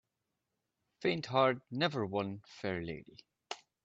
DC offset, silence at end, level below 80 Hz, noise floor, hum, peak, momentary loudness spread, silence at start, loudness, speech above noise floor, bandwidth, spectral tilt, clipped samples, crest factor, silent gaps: under 0.1%; 0.3 s; -72 dBFS; -87 dBFS; none; -16 dBFS; 17 LU; 1 s; -35 LUFS; 52 dB; 8.2 kHz; -6 dB/octave; under 0.1%; 22 dB; none